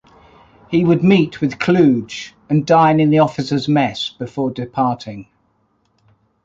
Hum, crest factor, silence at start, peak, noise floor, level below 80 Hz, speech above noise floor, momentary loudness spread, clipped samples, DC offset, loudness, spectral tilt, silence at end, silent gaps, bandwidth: none; 16 dB; 0.7 s; -2 dBFS; -62 dBFS; -52 dBFS; 47 dB; 13 LU; under 0.1%; under 0.1%; -16 LUFS; -7 dB/octave; 1.2 s; none; 7.8 kHz